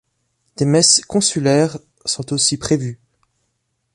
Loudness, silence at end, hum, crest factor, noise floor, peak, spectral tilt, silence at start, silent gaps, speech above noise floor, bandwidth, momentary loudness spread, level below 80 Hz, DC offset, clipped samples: -16 LUFS; 1 s; none; 18 dB; -70 dBFS; 0 dBFS; -3.5 dB/octave; 0.6 s; none; 54 dB; 11.5 kHz; 12 LU; -52 dBFS; under 0.1%; under 0.1%